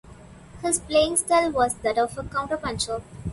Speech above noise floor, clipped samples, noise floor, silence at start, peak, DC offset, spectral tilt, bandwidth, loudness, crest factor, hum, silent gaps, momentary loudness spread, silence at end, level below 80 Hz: 22 dB; under 0.1%; -46 dBFS; 0.05 s; -8 dBFS; under 0.1%; -3 dB/octave; 12 kHz; -24 LUFS; 18 dB; none; none; 9 LU; 0 s; -46 dBFS